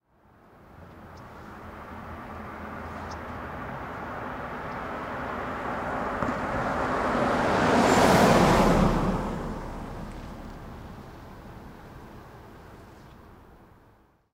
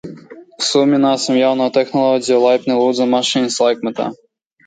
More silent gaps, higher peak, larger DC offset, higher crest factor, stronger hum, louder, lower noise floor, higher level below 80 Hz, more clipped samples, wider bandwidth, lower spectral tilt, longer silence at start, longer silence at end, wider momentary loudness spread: neither; second, -6 dBFS vs -2 dBFS; neither; first, 22 dB vs 14 dB; neither; second, -26 LUFS vs -15 LUFS; first, -60 dBFS vs -37 dBFS; first, -42 dBFS vs -64 dBFS; neither; first, 16 kHz vs 9.4 kHz; first, -5.5 dB/octave vs -4 dB/octave; first, 0.7 s vs 0.05 s; first, 0.75 s vs 0.5 s; first, 26 LU vs 7 LU